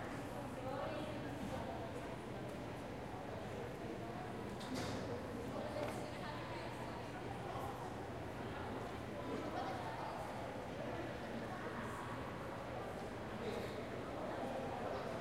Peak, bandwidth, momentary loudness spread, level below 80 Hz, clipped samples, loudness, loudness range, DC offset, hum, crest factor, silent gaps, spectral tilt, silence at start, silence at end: -28 dBFS; 16 kHz; 3 LU; -62 dBFS; under 0.1%; -46 LUFS; 1 LU; under 0.1%; none; 18 dB; none; -6 dB/octave; 0 s; 0 s